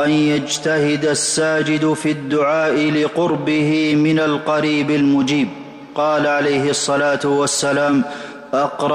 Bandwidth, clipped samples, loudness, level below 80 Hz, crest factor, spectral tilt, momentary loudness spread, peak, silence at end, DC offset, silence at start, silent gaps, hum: 12 kHz; under 0.1%; -17 LUFS; -58 dBFS; 10 dB; -4.5 dB/octave; 5 LU; -8 dBFS; 0 s; under 0.1%; 0 s; none; none